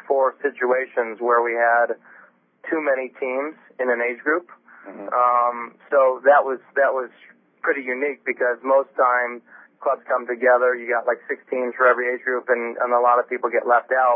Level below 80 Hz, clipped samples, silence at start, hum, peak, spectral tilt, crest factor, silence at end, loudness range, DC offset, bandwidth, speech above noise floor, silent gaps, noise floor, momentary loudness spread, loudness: under -90 dBFS; under 0.1%; 0.1 s; none; -2 dBFS; -8.5 dB/octave; 18 dB; 0 s; 3 LU; under 0.1%; 3.6 kHz; 24 dB; none; -44 dBFS; 10 LU; -21 LUFS